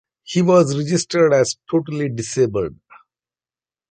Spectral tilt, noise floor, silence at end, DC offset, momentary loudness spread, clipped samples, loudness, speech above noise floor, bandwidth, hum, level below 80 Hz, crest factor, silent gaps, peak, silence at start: -5.5 dB/octave; under -90 dBFS; 1.2 s; under 0.1%; 9 LU; under 0.1%; -18 LUFS; over 73 dB; 9.4 kHz; none; -54 dBFS; 16 dB; none; -2 dBFS; 0.3 s